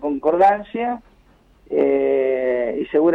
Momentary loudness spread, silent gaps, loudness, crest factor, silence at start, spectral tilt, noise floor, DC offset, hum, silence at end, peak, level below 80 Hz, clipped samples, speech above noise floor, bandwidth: 9 LU; none; -19 LUFS; 12 dB; 0 s; -8 dB/octave; -53 dBFS; under 0.1%; none; 0 s; -6 dBFS; -54 dBFS; under 0.1%; 36 dB; 5.2 kHz